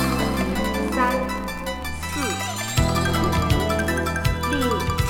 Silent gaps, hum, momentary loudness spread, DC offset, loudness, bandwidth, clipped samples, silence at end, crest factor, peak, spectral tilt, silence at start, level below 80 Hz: none; none; 7 LU; under 0.1%; -23 LUFS; 18 kHz; under 0.1%; 0 s; 16 dB; -6 dBFS; -5 dB/octave; 0 s; -32 dBFS